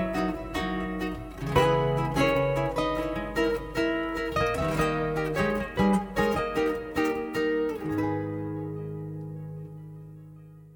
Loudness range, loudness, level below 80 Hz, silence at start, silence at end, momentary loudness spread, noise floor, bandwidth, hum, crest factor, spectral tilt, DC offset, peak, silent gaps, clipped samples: 4 LU; -28 LUFS; -44 dBFS; 0 s; 0 s; 14 LU; -48 dBFS; 19.5 kHz; none; 18 dB; -6.5 dB/octave; under 0.1%; -10 dBFS; none; under 0.1%